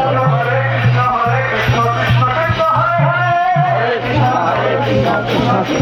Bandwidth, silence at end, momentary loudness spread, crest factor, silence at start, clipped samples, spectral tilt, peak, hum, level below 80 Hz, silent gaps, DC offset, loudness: 11.5 kHz; 0 s; 2 LU; 12 dB; 0 s; under 0.1%; -7 dB/octave; -2 dBFS; none; -38 dBFS; none; under 0.1%; -14 LUFS